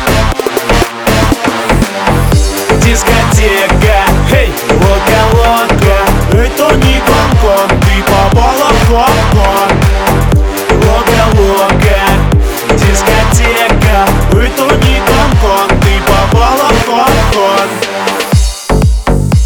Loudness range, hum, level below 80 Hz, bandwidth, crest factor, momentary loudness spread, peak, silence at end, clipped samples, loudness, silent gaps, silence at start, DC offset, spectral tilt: 1 LU; none; -14 dBFS; over 20 kHz; 8 dB; 3 LU; 0 dBFS; 0 s; 0.9%; -8 LUFS; none; 0 s; under 0.1%; -5 dB/octave